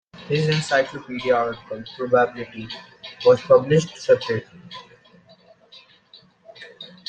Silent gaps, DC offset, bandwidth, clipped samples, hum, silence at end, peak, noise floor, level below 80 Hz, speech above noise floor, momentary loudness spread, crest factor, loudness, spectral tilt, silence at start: none; under 0.1%; 9 kHz; under 0.1%; none; 0.2 s; -4 dBFS; -53 dBFS; -60 dBFS; 32 dB; 23 LU; 20 dB; -21 LUFS; -5.5 dB/octave; 0.15 s